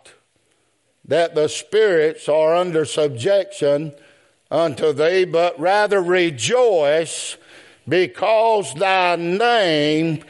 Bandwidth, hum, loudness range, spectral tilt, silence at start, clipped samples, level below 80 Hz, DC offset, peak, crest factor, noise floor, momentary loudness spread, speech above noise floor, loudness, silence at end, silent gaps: 11.5 kHz; none; 2 LU; -4 dB/octave; 1.1 s; under 0.1%; -70 dBFS; under 0.1%; -2 dBFS; 16 dB; -64 dBFS; 6 LU; 47 dB; -18 LUFS; 0.05 s; none